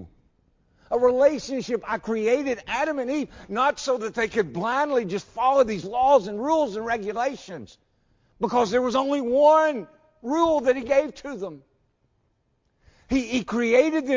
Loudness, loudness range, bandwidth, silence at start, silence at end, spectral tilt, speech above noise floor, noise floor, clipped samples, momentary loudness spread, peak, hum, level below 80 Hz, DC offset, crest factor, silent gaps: -23 LUFS; 4 LU; 7.6 kHz; 0 s; 0 s; -5 dB/octave; 47 dB; -70 dBFS; under 0.1%; 11 LU; -6 dBFS; none; -56 dBFS; under 0.1%; 18 dB; none